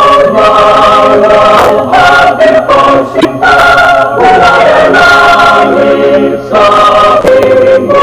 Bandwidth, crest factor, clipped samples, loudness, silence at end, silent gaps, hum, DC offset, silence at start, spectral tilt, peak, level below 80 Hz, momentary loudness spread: 15.5 kHz; 4 dB; 10%; -4 LUFS; 0 s; none; none; under 0.1%; 0 s; -4.5 dB/octave; 0 dBFS; -32 dBFS; 3 LU